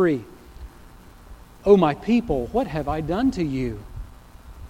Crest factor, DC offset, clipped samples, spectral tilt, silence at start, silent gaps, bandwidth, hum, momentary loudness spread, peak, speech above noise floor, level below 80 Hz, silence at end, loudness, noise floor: 20 dB; under 0.1%; under 0.1%; -8 dB/octave; 0 s; none; 16 kHz; 60 Hz at -45 dBFS; 24 LU; -2 dBFS; 25 dB; -40 dBFS; 0 s; -22 LUFS; -46 dBFS